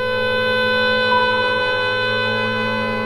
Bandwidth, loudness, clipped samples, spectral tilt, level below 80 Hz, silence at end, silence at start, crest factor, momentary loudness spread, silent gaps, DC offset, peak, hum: 15 kHz; -17 LUFS; under 0.1%; -5 dB/octave; -50 dBFS; 0 s; 0 s; 12 dB; 4 LU; none; under 0.1%; -6 dBFS; none